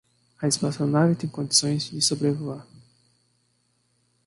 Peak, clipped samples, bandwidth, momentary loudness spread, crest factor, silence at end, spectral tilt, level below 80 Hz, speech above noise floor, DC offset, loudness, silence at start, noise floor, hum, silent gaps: -2 dBFS; under 0.1%; 11.5 kHz; 10 LU; 24 dB; 1.65 s; -4 dB/octave; -66 dBFS; 45 dB; under 0.1%; -24 LUFS; 0.4 s; -69 dBFS; 60 Hz at -45 dBFS; none